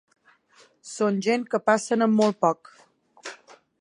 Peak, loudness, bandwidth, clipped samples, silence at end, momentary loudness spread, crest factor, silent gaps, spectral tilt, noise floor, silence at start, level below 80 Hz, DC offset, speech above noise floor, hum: -6 dBFS; -23 LUFS; 10.5 kHz; under 0.1%; 0.45 s; 20 LU; 20 dB; none; -5 dB/octave; -59 dBFS; 0.85 s; -78 dBFS; under 0.1%; 36 dB; none